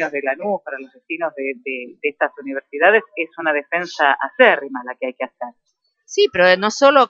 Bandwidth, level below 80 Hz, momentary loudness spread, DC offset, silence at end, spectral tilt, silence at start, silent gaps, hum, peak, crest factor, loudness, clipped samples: 7.8 kHz; -66 dBFS; 15 LU; under 0.1%; 0.05 s; -3 dB/octave; 0 s; none; none; 0 dBFS; 18 dB; -18 LUFS; under 0.1%